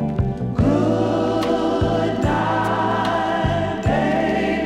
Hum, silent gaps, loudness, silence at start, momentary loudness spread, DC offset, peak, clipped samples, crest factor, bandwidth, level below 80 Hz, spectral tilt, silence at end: none; none; -20 LUFS; 0 s; 3 LU; under 0.1%; -6 dBFS; under 0.1%; 14 dB; 13 kHz; -36 dBFS; -7 dB/octave; 0 s